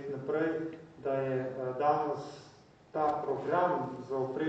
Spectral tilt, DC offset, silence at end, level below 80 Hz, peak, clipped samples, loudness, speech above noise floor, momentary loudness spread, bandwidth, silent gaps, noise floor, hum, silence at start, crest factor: -7.5 dB/octave; under 0.1%; 0 s; -72 dBFS; -16 dBFS; under 0.1%; -33 LUFS; 25 dB; 11 LU; 8.2 kHz; none; -58 dBFS; none; 0 s; 18 dB